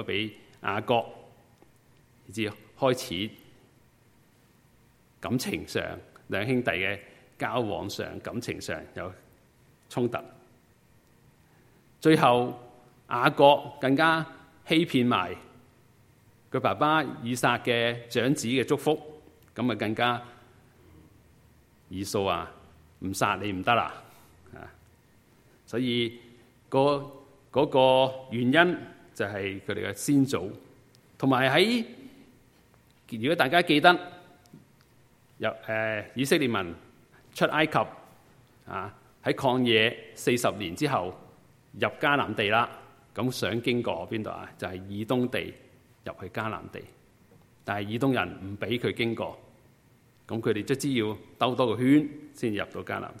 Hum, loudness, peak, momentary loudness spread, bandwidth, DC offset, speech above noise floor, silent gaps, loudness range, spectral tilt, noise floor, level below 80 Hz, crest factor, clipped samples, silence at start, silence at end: none; -27 LUFS; -2 dBFS; 17 LU; 16 kHz; under 0.1%; 34 dB; none; 9 LU; -5 dB/octave; -61 dBFS; -64 dBFS; 26 dB; under 0.1%; 0 s; 0 s